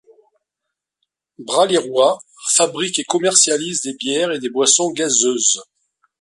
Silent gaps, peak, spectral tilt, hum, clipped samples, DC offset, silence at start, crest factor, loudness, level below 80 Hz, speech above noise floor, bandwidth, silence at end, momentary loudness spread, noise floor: none; 0 dBFS; -1.5 dB/octave; none; under 0.1%; under 0.1%; 1.4 s; 18 dB; -16 LUFS; -68 dBFS; 64 dB; 11.5 kHz; 0.6 s; 8 LU; -81 dBFS